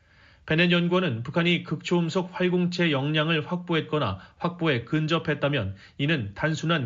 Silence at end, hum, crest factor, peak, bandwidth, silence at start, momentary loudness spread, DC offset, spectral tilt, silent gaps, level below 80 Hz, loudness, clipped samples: 0 s; none; 18 dB; -6 dBFS; 7.6 kHz; 0.45 s; 6 LU; under 0.1%; -4.5 dB/octave; none; -58 dBFS; -25 LUFS; under 0.1%